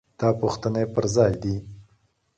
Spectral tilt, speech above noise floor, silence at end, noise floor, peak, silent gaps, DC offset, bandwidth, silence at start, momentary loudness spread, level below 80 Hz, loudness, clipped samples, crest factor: -6.5 dB/octave; 43 dB; 0.55 s; -65 dBFS; -6 dBFS; none; under 0.1%; 9.2 kHz; 0.2 s; 9 LU; -48 dBFS; -24 LUFS; under 0.1%; 18 dB